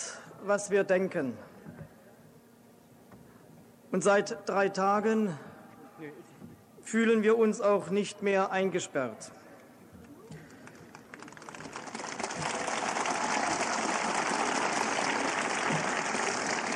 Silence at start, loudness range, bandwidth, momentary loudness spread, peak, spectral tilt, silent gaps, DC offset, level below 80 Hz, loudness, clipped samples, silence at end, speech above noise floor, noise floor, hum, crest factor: 0 s; 9 LU; 14.5 kHz; 23 LU; -12 dBFS; -3.5 dB/octave; none; under 0.1%; -72 dBFS; -29 LUFS; under 0.1%; 0 s; 29 dB; -58 dBFS; none; 18 dB